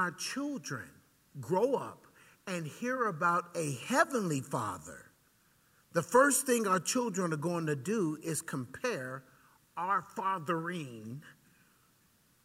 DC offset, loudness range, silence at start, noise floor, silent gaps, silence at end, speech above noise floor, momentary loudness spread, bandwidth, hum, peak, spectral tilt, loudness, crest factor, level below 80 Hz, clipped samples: under 0.1%; 6 LU; 0 s; -69 dBFS; none; 1.1 s; 36 dB; 18 LU; 16 kHz; none; -12 dBFS; -4.5 dB/octave; -33 LUFS; 22 dB; -76 dBFS; under 0.1%